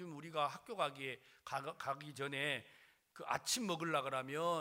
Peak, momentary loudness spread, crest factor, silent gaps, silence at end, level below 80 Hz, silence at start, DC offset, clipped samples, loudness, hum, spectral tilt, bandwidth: -20 dBFS; 8 LU; 22 dB; none; 0 s; -84 dBFS; 0 s; under 0.1%; under 0.1%; -41 LUFS; none; -3 dB/octave; 16 kHz